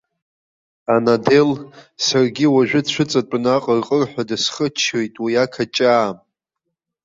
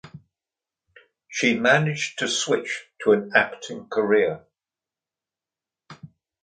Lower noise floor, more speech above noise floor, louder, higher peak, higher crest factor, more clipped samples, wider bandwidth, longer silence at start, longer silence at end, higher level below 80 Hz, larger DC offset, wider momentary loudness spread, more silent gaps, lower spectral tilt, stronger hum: second, -79 dBFS vs under -90 dBFS; second, 62 dB vs over 68 dB; first, -17 LUFS vs -22 LUFS; about the same, -2 dBFS vs -4 dBFS; second, 16 dB vs 22 dB; neither; second, 7.8 kHz vs 9.4 kHz; first, 0.9 s vs 0.05 s; first, 0.9 s vs 0.35 s; first, -60 dBFS vs -68 dBFS; neither; second, 7 LU vs 12 LU; neither; about the same, -4.5 dB/octave vs -4 dB/octave; neither